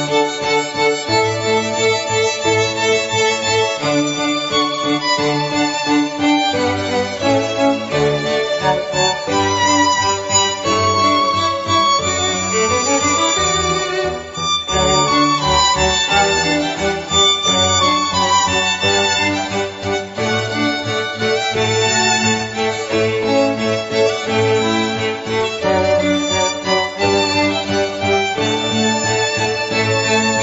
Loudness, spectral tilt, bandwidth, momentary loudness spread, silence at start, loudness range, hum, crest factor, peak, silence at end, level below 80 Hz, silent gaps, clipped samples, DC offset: -15 LUFS; -3 dB/octave; 8 kHz; 5 LU; 0 s; 3 LU; none; 16 dB; 0 dBFS; 0 s; -44 dBFS; none; under 0.1%; under 0.1%